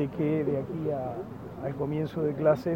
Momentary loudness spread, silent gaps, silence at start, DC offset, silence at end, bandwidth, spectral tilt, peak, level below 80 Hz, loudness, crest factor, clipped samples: 11 LU; none; 0 s; under 0.1%; 0 s; 16.5 kHz; -9.5 dB/octave; -10 dBFS; -58 dBFS; -30 LUFS; 18 dB; under 0.1%